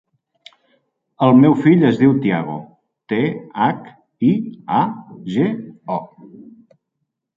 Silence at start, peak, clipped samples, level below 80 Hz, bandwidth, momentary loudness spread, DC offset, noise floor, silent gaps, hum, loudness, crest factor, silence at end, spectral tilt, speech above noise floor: 1.2 s; -2 dBFS; under 0.1%; -60 dBFS; 7.4 kHz; 15 LU; under 0.1%; -76 dBFS; none; none; -17 LUFS; 16 dB; 1.3 s; -9 dB/octave; 60 dB